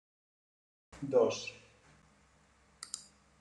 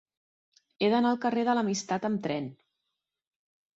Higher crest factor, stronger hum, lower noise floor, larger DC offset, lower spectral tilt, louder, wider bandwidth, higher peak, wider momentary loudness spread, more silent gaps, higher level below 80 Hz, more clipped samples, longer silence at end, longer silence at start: about the same, 22 dB vs 18 dB; neither; second, -67 dBFS vs -85 dBFS; neither; about the same, -4 dB/octave vs -5 dB/octave; second, -35 LUFS vs -28 LUFS; first, 11.5 kHz vs 8 kHz; second, -16 dBFS vs -12 dBFS; first, 20 LU vs 8 LU; neither; about the same, -72 dBFS vs -74 dBFS; neither; second, 0.4 s vs 1.25 s; first, 0.95 s vs 0.8 s